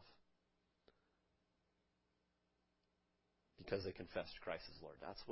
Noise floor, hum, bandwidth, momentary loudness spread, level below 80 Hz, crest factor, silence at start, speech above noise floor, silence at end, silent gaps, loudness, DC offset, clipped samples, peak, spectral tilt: -85 dBFS; none; 5.6 kHz; 10 LU; -72 dBFS; 24 dB; 0 s; 36 dB; 0 s; none; -49 LUFS; under 0.1%; under 0.1%; -28 dBFS; -3.5 dB/octave